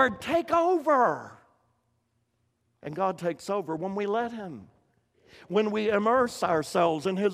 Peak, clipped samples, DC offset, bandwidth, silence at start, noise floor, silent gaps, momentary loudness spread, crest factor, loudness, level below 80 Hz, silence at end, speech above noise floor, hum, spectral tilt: -8 dBFS; under 0.1%; under 0.1%; 15.5 kHz; 0 s; -74 dBFS; none; 16 LU; 20 dB; -27 LUFS; -66 dBFS; 0 s; 47 dB; none; -5.5 dB/octave